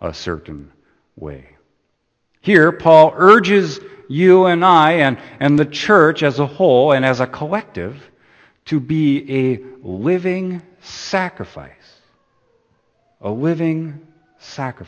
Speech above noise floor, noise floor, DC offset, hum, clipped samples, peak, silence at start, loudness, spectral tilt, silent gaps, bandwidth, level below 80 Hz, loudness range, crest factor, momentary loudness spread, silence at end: 53 dB; -68 dBFS; under 0.1%; none; under 0.1%; 0 dBFS; 0 s; -14 LUFS; -6.5 dB/octave; none; 8.6 kHz; -52 dBFS; 13 LU; 16 dB; 21 LU; 0.05 s